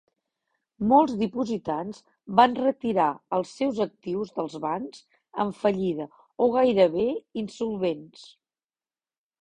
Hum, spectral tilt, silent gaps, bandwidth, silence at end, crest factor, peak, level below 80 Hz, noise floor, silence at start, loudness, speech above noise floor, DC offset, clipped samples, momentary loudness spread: none; -6.5 dB/octave; none; 9.8 kHz; 1.2 s; 24 dB; -2 dBFS; -64 dBFS; under -90 dBFS; 0.8 s; -25 LUFS; over 65 dB; under 0.1%; under 0.1%; 14 LU